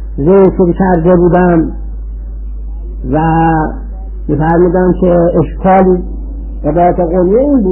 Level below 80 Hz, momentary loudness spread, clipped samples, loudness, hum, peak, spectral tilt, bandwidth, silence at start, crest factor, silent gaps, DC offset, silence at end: -20 dBFS; 17 LU; under 0.1%; -10 LUFS; none; 0 dBFS; -13 dB/octave; 3.1 kHz; 0 s; 10 dB; none; under 0.1%; 0 s